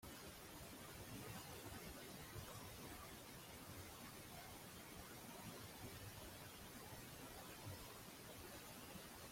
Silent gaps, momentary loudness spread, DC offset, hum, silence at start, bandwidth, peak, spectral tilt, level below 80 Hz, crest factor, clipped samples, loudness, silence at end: none; 2 LU; under 0.1%; none; 0 s; 16.5 kHz; -42 dBFS; -3.5 dB/octave; -70 dBFS; 16 dB; under 0.1%; -55 LUFS; 0 s